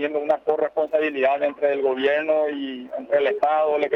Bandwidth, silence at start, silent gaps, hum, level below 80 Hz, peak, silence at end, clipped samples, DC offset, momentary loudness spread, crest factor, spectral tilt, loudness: 5.8 kHz; 0 s; none; none; -72 dBFS; -8 dBFS; 0 s; under 0.1%; under 0.1%; 5 LU; 12 dB; -5.5 dB/octave; -22 LUFS